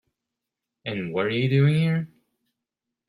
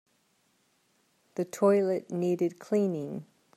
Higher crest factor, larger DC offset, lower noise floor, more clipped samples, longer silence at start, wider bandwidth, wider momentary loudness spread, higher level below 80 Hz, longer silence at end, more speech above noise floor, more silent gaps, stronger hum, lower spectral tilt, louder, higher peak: about the same, 16 dB vs 18 dB; neither; first, -86 dBFS vs -71 dBFS; neither; second, 0.85 s vs 1.35 s; second, 11.5 kHz vs 14 kHz; about the same, 15 LU vs 15 LU; first, -66 dBFS vs -82 dBFS; first, 1 s vs 0.35 s; first, 63 dB vs 43 dB; neither; neither; about the same, -8.5 dB/octave vs -7.5 dB/octave; first, -24 LUFS vs -29 LUFS; about the same, -10 dBFS vs -12 dBFS